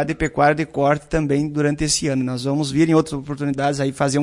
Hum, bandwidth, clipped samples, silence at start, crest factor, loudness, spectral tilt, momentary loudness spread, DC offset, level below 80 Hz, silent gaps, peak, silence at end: none; 11.5 kHz; under 0.1%; 0 s; 16 dB; -20 LUFS; -5 dB/octave; 5 LU; under 0.1%; -40 dBFS; none; -4 dBFS; 0 s